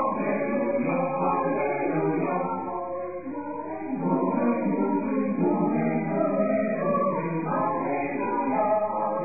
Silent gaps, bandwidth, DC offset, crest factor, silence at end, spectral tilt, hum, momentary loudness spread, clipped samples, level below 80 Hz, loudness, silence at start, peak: none; 2.6 kHz; 0.4%; 14 dB; 0 s; -14.5 dB/octave; none; 8 LU; under 0.1%; -74 dBFS; -26 LUFS; 0 s; -12 dBFS